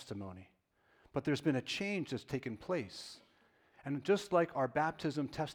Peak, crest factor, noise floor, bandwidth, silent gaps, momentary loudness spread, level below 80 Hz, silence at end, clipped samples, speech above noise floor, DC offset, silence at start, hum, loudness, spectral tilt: -18 dBFS; 20 dB; -72 dBFS; 17 kHz; none; 16 LU; -70 dBFS; 0 s; under 0.1%; 35 dB; under 0.1%; 0 s; none; -37 LUFS; -6 dB/octave